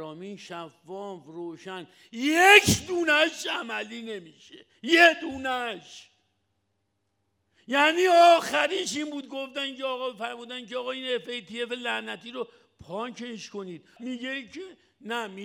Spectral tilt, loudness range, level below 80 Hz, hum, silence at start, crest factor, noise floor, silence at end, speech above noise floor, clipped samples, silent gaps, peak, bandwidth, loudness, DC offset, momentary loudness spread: -3 dB/octave; 12 LU; -62 dBFS; none; 0 s; 26 dB; -77 dBFS; 0 s; 50 dB; under 0.1%; none; 0 dBFS; over 20 kHz; -24 LUFS; under 0.1%; 22 LU